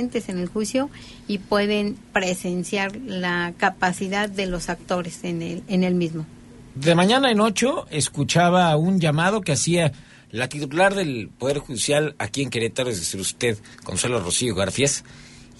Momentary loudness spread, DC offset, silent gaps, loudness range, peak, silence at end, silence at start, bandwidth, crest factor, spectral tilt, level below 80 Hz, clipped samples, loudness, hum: 10 LU; under 0.1%; none; 5 LU; -4 dBFS; 0.15 s; 0 s; 11.5 kHz; 18 dB; -4.5 dB/octave; -50 dBFS; under 0.1%; -22 LUFS; none